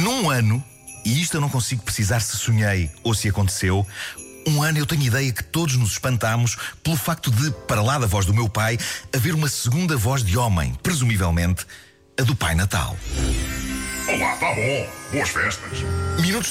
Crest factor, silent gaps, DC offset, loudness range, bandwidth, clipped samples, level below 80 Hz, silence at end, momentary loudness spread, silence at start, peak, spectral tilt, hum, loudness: 10 dB; none; under 0.1%; 2 LU; 16 kHz; under 0.1%; -36 dBFS; 0 s; 6 LU; 0 s; -12 dBFS; -4.5 dB/octave; none; -22 LUFS